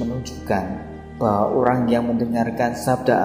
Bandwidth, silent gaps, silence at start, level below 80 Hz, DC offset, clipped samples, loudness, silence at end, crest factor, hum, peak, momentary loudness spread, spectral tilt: 16 kHz; none; 0 s; -46 dBFS; under 0.1%; under 0.1%; -21 LUFS; 0 s; 18 dB; none; -2 dBFS; 11 LU; -7 dB/octave